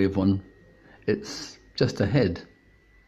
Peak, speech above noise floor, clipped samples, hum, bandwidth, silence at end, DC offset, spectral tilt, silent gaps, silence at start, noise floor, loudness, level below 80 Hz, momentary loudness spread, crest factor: -8 dBFS; 33 dB; under 0.1%; none; 12 kHz; 0.65 s; under 0.1%; -6.5 dB/octave; none; 0 s; -58 dBFS; -27 LUFS; -54 dBFS; 14 LU; 20 dB